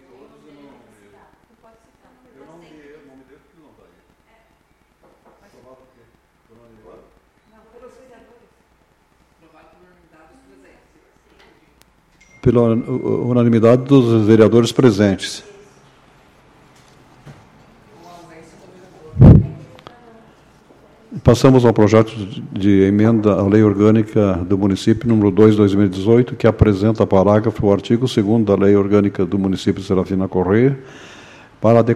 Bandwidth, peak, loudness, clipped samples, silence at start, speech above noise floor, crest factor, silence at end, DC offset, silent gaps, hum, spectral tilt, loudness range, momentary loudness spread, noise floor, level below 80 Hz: 12 kHz; 0 dBFS; -14 LUFS; under 0.1%; 12.45 s; 44 dB; 16 dB; 0 s; under 0.1%; none; none; -8 dB/octave; 6 LU; 9 LU; -58 dBFS; -36 dBFS